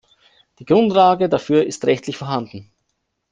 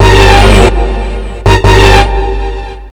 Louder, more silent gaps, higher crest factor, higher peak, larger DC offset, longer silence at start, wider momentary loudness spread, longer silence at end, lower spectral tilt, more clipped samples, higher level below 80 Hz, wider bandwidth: second, -17 LUFS vs -7 LUFS; neither; first, 16 dB vs 6 dB; about the same, -2 dBFS vs 0 dBFS; neither; first, 0.6 s vs 0 s; second, 11 LU vs 14 LU; first, 0.7 s vs 0 s; about the same, -6 dB/octave vs -5 dB/octave; second, under 0.1% vs 10%; second, -58 dBFS vs -10 dBFS; second, 9.6 kHz vs 13.5 kHz